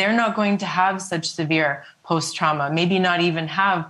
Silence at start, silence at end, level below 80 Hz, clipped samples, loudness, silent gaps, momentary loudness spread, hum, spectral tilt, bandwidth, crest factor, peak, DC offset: 0 s; 0 s; -66 dBFS; under 0.1%; -21 LUFS; none; 6 LU; none; -4.5 dB/octave; 12 kHz; 16 dB; -4 dBFS; under 0.1%